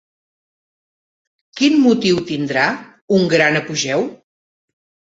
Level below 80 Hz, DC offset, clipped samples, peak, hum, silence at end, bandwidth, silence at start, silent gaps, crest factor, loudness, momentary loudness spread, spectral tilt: -58 dBFS; under 0.1%; under 0.1%; -2 dBFS; none; 1 s; 8 kHz; 1.55 s; 3.02-3.08 s; 18 dB; -16 LUFS; 9 LU; -4.5 dB/octave